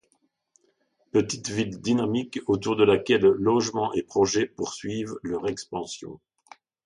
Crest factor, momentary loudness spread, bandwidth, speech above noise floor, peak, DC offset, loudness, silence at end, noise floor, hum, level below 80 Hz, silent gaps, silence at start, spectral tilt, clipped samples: 18 dB; 13 LU; 11 kHz; 46 dB; -8 dBFS; under 0.1%; -25 LUFS; 0.7 s; -71 dBFS; none; -58 dBFS; none; 1.15 s; -5 dB/octave; under 0.1%